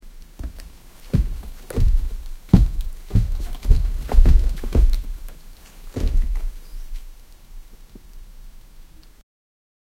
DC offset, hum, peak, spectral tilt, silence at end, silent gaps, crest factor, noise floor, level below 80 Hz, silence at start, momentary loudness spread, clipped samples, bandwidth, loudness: under 0.1%; none; 0 dBFS; -7.5 dB/octave; 1.15 s; none; 20 dB; -43 dBFS; -20 dBFS; 0.05 s; 22 LU; under 0.1%; 13 kHz; -23 LUFS